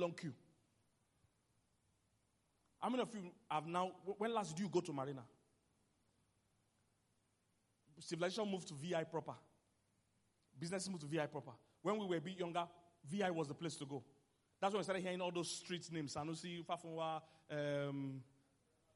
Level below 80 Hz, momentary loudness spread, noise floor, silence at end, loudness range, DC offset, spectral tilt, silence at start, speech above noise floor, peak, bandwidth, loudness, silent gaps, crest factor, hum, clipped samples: -86 dBFS; 10 LU; -82 dBFS; 0.7 s; 6 LU; under 0.1%; -5 dB/octave; 0 s; 38 dB; -24 dBFS; 11.5 kHz; -44 LUFS; none; 22 dB; none; under 0.1%